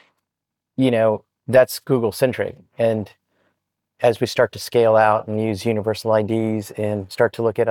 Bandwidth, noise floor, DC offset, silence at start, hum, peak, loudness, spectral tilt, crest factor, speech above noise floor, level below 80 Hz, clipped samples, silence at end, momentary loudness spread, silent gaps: 19 kHz; -83 dBFS; under 0.1%; 0.8 s; none; -4 dBFS; -20 LUFS; -6 dB/octave; 16 dB; 64 dB; -64 dBFS; under 0.1%; 0 s; 9 LU; none